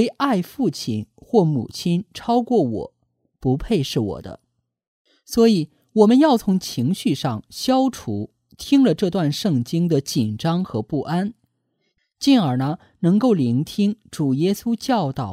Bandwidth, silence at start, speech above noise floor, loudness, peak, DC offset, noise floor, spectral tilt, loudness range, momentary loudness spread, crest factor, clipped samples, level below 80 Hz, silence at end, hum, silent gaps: 15.5 kHz; 0 s; 52 dB; -20 LUFS; -2 dBFS; under 0.1%; -71 dBFS; -6.5 dB/octave; 4 LU; 10 LU; 18 dB; under 0.1%; -50 dBFS; 0 s; none; 4.87-5.05 s